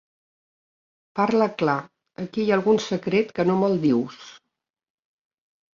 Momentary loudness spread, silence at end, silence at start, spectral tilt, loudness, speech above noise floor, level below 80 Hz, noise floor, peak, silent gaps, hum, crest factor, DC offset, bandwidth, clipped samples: 13 LU; 1.4 s; 1.15 s; -6.5 dB/octave; -22 LUFS; 60 dB; -66 dBFS; -82 dBFS; -6 dBFS; none; none; 20 dB; under 0.1%; 7.4 kHz; under 0.1%